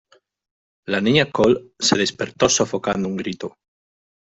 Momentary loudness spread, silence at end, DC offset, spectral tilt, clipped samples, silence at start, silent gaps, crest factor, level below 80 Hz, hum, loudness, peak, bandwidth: 12 LU; 0.7 s; under 0.1%; -3.5 dB/octave; under 0.1%; 0.9 s; none; 20 dB; -54 dBFS; none; -19 LUFS; -2 dBFS; 8.2 kHz